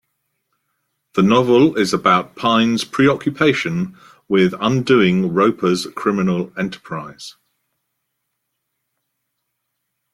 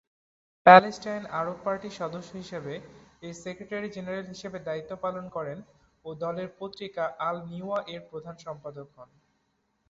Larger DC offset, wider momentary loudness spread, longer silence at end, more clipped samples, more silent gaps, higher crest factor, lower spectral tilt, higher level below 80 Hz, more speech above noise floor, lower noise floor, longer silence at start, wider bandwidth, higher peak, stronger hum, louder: neither; second, 14 LU vs 19 LU; first, 2.85 s vs 0.85 s; neither; neither; second, 18 dB vs 26 dB; first, -6 dB/octave vs -3.5 dB/octave; first, -58 dBFS vs -68 dBFS; first, 59 dB vs 46 dB; about the same, -75 dBFS vs -74 dBFS; first, 1.15 s vs 0.65 s; first, 14 kHz vs 7.8 kHz; about the same, -2 dBFS vs -2 dBFS; neither; first, -17 LUFS vs -27 LUFS